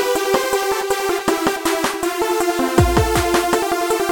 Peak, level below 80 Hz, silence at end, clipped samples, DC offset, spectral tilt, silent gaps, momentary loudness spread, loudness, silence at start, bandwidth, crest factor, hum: 0 dBFS; -32 dBFS; 0 s; under 0.1%; 0.1%; -4.5 dB/octave; none; 4 LU; -18 LUFS; 0 s; 17.5 kHz; 18 dB; none